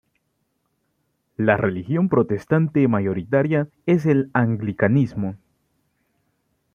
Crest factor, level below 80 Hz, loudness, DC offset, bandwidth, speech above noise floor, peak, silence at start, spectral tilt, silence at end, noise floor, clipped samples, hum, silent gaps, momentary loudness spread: 20 dB; -58 dBFS; -21 LUFS; under 0.1%; 6.8 kHz; 52 dB; -2 dBFS; 1.4 s; -10 dB/octave; 1.4 s; -72 dBFS; under 0.1%; none; none; 5 LU